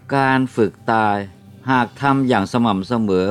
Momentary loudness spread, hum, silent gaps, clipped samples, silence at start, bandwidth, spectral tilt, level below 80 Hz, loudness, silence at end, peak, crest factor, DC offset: 4 LU; none; none; under 0.1%; 0.05 s; 12 kHz; -7 dB/octave; -56 dBFS; -18 LUFS; 0 s; -2 dBFS; 16 dB; under 0.1%